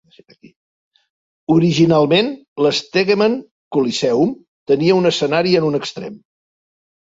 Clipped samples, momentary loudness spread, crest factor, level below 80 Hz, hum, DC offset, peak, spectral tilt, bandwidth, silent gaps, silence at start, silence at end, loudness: under 0.1%; 13 LU; 16 dB; -58 dBFS; none; under 0.1%; -2 dBFS; -5.5 dB/octave; 8 kHz; 2.48-2.56 s, 3.51-3.71 s, 4.48-4.66 s; 1.5 s; 0.85 s; -16 LUFS